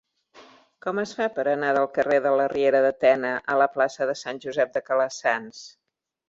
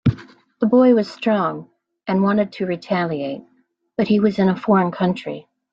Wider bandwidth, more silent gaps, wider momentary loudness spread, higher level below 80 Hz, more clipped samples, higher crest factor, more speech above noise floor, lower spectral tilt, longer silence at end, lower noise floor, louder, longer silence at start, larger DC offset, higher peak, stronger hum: about the same, 7.8 kHz vs 7.4 kHz; neither; second, 9 LU vs 17 LU; second, -68 dBFS vs -54 dBFS; neither; about the same, 18 dB vs 16 dB; about the same, 29 dB vs 26 dB; second, -4.5 dB/octave vs -8.5 dB/octave; first, 0.6 s vs 0.3 s; first, -53 dBFS vs -44 dBFS; second, -23 LUFS vs -19 LUFS; first, 0.35 s vs 0.05 s; neither; second, -8 dBFS vs -4 dBFS; neither